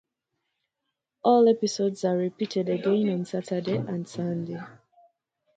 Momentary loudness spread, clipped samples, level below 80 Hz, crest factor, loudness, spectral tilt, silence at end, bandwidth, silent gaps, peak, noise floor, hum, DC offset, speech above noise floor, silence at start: 13 LU; under 0.1%; -74 dBFS; 20 dB; -26 LUFS; -6.5 dB/octave; 0.85 s; 9.2 kHz; none; -8 dBFS; -83 dBFS; none; under 0.1%; 58 dB; 1.25 s